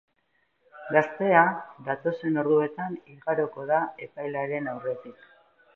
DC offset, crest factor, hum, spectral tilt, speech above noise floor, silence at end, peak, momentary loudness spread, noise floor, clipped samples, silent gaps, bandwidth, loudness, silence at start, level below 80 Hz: under 0.1%; 24 dB; none; -8.5 dB/octave; 46 dB; 0.65 s; -4 dBFS; 14 LU; -72 dBFS; under 0.1%; none; 6.4 kHz; -27 LUFS; 0.75 s; -78 dBFS